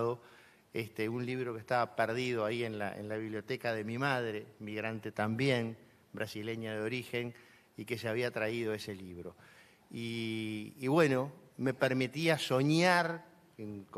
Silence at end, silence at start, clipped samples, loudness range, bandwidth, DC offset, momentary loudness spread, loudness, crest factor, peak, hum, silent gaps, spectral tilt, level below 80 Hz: 0 s; 0 s; under 0.1%; 7 LU; 14.5 kHz; under 0.1%; 16 LU; -35 LUFS; 22 dB; -12 dBFS; none; none; -5.5 dB/octave; -76 dBFS